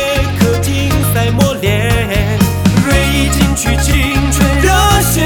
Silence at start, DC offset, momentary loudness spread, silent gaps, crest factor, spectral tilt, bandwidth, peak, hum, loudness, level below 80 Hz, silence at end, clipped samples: 0 s; under 0.1%; 3 LU; none; 12 dB; -4.5 dB/octave; over 20 kHz; 0 dBFS; none; -12 LUFS; -18 dBFS; 0 s; under 0.1%